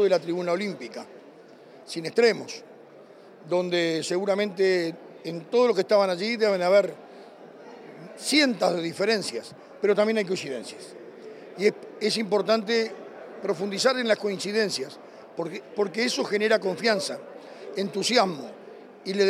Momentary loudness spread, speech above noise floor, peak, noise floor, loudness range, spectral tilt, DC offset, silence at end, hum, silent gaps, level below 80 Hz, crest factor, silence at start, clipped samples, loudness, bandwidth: 21 LU; 24 dB; -6 dBFS; -49 dBFS; 4 LU; -4 dB/octave; under 0.1%; 0 s; none; none; -86 dBFS; 20 dB; 0 s; under 0.1%; -25 LUFS; 15 kHz